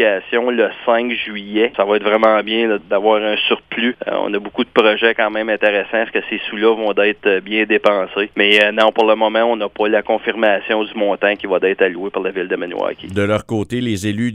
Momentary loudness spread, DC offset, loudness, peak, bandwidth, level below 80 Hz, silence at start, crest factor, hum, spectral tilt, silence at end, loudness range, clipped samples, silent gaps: 8 LU; under 0.1%; -16 LUFS; 0 dBFS; 12.5 kHz; -56 dBFS; 0 s; 16 dB; none; -5 dB/octave; 0 s; 3 LU; under 0.1%; none